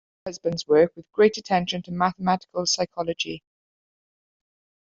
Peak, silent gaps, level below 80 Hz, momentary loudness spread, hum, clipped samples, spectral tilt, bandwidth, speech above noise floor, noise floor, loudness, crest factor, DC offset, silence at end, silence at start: -6 dBFS; none; -62 dBFS; 10 LU; none; under 0.1%; -4 dB/octave; 7.8 kHz; over 67 dB; under -90 dBFS; -24 LUFS; 20 dB; under 0.1%; 1.55 s; 0.25 s